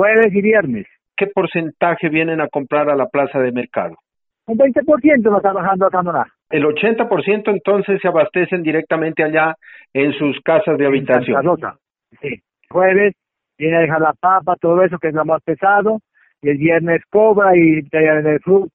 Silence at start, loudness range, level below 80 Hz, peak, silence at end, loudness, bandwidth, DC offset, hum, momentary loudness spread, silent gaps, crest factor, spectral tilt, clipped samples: 0 s; 3 LU; -58 dBFS; 0 dBFS; 0.05 s; -15 LUFS; 4.1 kHz; under 0.1%; none; 10 LU; none; 16 dB; -5.5 dB/octave; under 0.1%